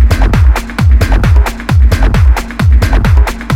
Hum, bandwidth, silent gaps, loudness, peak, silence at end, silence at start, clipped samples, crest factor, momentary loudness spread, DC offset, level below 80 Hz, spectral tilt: none; 15 kHz; none; -10 LUFS; 0 dBFS; 0 s; 0 s; 1%; 8 dB; 2 LU; under 0.1%; -8 dBFS; -6.5 dB/octave